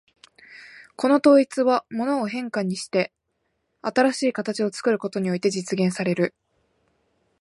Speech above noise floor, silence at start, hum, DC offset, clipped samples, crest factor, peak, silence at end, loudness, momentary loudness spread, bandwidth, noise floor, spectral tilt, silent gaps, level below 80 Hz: 53 dB; 0.5 s; none; under 0.1%; under 0.1%; 18 dB; -6 dBFS; 1.1 s; -23 LUFS; 10 LU; 11.5 kHz; -74 dBFS; -5.5 dB/octave; none; -72 dBFS